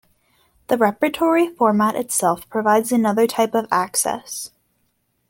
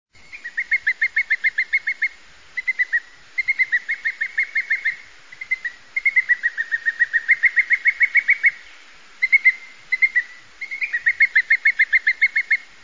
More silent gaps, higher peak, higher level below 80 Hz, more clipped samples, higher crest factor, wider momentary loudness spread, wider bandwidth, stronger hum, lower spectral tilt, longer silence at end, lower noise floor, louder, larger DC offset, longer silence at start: neither; first, -2 dBFS vs -6 dBFS; about the same, -62 dBFS vs -66 dBFS; neither; about the same, 18 dB vs 16 dB; second, 7 LU vs 11 LU; first, 17 kHz vs 7.6 kHz; first, 60 Hz at -45 dBFS vs none; first, -4 dB/octave vs 1 dB/octave; first, 0.85 s vs 0.25 s; first, -68 dBFS vs -47 dBFS; about the same, -19 LUFS vs -18 LUFS; second, under 0.1% vs 0.4%; first, 0.7 s vs 0.35 s